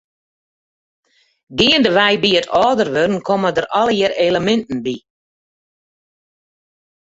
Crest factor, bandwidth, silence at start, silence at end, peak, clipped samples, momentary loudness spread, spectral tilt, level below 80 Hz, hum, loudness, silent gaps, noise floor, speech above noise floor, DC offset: 18 dB; 8 kHz; 1.5 s; 2.15 s; -2 dBFS; under 0.1%; 11 LU; -4.5 dB/octave; -52 dBFS; none; -15 LUFS; none; under -90 dBFS; over 75 dB; under 0.1%